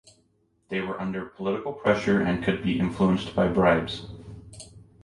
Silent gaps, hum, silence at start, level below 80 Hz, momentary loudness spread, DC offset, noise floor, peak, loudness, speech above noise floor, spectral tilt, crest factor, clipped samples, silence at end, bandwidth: none; none; 0.7 s; -48 dBFS; 22 LU; under 0.1%; -67 dBFS; -8 dBFS; -25 LUFS; 43 dB; -7 dB/octave; 18 dB; under 0.1%; 0.2 s; 11 kHz